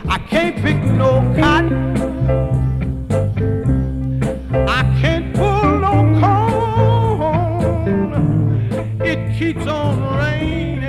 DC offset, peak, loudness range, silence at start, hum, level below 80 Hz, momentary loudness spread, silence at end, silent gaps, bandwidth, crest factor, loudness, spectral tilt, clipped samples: under 0.1%; 0 dBFS; 3 LU; 0 s; none; -26 dBFS; 6 LU; 0 s; none; 11 kHz; 16 dB; -16 LUFS; -7.5 dB/octave; under 0.1%